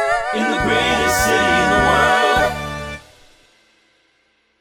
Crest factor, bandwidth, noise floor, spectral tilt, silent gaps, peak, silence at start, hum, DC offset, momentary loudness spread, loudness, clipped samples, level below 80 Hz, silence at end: 16 dB; 18 kHz; -62 dBFS; -3.5 dB/octave; none; -2 dBFS; 0 s; none; under 0.1%; 14 LU; -16 LUFS; under 0.1%; -36 dBFS; 1.6 s